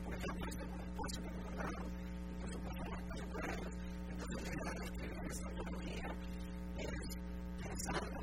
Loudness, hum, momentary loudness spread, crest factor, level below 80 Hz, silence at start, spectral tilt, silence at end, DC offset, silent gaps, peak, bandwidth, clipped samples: -45 LUFS; none; 3 LU; 16 dB; -48 dBFS; 0 s; -5 dB/octave; 0 s; 0.1%; none; -26 dBFS; 16 kHz; under 0.1%